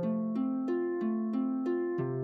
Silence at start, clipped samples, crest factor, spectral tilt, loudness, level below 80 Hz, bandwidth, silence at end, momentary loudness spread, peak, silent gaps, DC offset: 0 s; under 0.1%; 10 dB; -10.5 dB/octave; -32 LUFS; -80 dBFS; 4.9 kHz; 0 s; 1 LU; -22 dBFS; none; under 0.1%